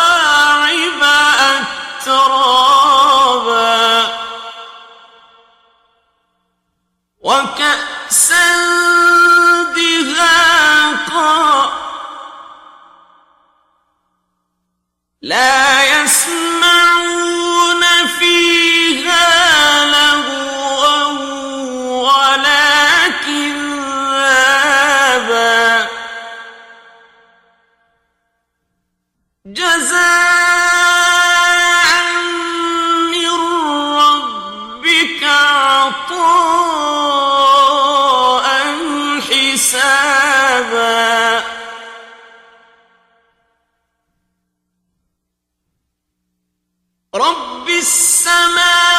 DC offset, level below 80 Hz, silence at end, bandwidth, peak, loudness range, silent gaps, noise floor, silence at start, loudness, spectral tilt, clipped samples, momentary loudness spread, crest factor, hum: under 0.1%; -54 dBFS; 0 s; 16.5 kHz; 0 dBFS; 9 LU; none; -74 dBFS; 0 s; -10 LUFS; 0.5 dB/octave; under 0.1%; 11 LU; 14 dB; 60 Hz at -70 dBFS